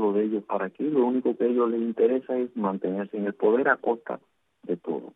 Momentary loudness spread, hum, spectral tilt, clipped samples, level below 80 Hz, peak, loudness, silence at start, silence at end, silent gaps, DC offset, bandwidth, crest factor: 9 LU; none; -10 dB/octave; under 0.1%; -82 dBFS; -6 dBFS; -26 LUFS; 0 s; 0.05 s; none; under 0.1%; 3.9 kHz; 18 dB